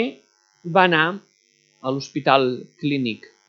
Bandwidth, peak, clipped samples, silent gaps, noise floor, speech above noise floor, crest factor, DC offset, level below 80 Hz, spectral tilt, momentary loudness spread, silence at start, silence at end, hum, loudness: 7.2 kHz; 0 dBFS; under 0.1%; none; -62 dBFS; 41 dB; 22 dB; under 0.1%; -76 dBFS; -5.5 dB/octave; 13 LU; 0 s; 0.35 s; none; -21 LUFS